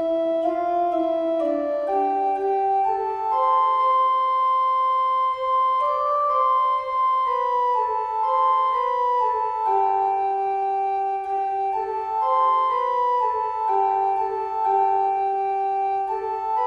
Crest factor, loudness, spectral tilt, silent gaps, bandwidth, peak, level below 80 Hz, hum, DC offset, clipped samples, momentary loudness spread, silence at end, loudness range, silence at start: 12 dB; -22 LUFS; -5 dB/octave; none; 6.6 kHz; -10 dBFS; -64 dBFS; none; under 0.1%; under 0.1%; 5 LU; 0 s; 2 LU; 0 s